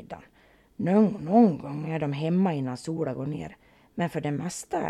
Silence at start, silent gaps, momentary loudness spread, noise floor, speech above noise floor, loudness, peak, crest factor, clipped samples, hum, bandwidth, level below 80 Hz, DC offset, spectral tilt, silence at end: 0 s; none; 16 LU; -59 dBFS; 34 dB; -26 LUFS; -8 dBFS; 18 dB; under 0.1%; none; 13 kHz; -62 dBFS; under 0.1%; -7 dB/octave; 0 s